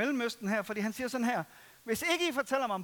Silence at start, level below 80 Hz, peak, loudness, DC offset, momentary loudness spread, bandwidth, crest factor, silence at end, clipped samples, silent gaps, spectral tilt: 0 s; -72 dBFS; -16 dBFS; -32 LUFS; under 0.1%; 7 LU; 19 kHz; 18 dB; 0 s; under 0.1%; none; -3.5 dB/octave